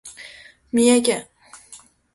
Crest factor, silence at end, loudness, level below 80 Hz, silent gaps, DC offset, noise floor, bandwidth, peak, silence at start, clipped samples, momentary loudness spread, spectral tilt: 18 dB; 0.4 s; -19 LUFS; -60 dBFS; none; under 0.1%; -48 dBFS; 12 kHz; -4 dBFS; 0.05 s; under 0.1%; 25 LU; -3 dB/octave